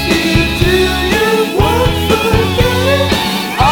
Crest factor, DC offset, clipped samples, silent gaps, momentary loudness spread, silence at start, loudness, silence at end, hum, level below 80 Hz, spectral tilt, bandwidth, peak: 12 dB; under 0.1%; under 0.1%; none; 2 LU; 0 s; -12 LUFS; 0 s; none; -22 dBFS; -5 dB/octave; over 20 kHz; 0 dBFS